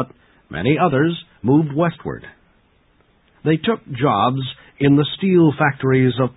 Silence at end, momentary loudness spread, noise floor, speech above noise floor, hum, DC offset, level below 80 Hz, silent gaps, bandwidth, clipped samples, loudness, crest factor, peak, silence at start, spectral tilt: 0.05 s; 15 LU; -58 dBFS; 41 dB; none; under 0.1%; -50 dBFS; none; 4 kHz; under 0.1%; -18 LUFS; 16 dB; -4 dBFS; 0 s; -12.5 dB/octave